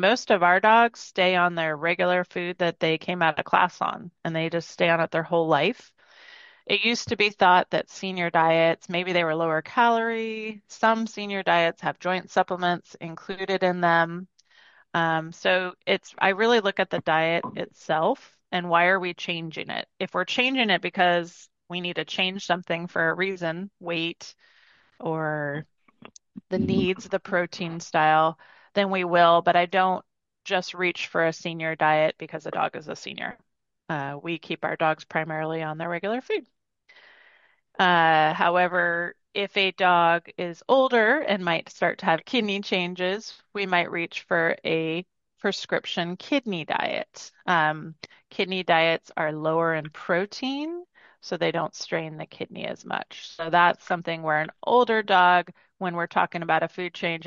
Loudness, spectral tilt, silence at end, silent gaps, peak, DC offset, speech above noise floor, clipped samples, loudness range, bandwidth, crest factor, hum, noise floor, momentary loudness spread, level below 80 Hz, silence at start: -24 LUFS; -5 dB/octave; 0 s; none; -4 dBFS; under 0.1%; 36 dB; under 0.1%; 6 LU; 7.6 kHz; 20 dB; none; -60 dBFS; 13 LU; -66 dBFS; 0 s